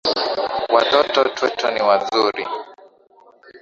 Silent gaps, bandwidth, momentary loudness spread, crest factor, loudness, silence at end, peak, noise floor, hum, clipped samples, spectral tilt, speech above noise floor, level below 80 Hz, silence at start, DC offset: none; 7.6 kHz; 9 LU; 20 dB; -18 LUFS; 0.05 s; 0 dBFS; -51 dBFS; none; under 0.1%; -3 dB/octave; 33 dB; -62 dBFS; 0.05 s; under 0.1%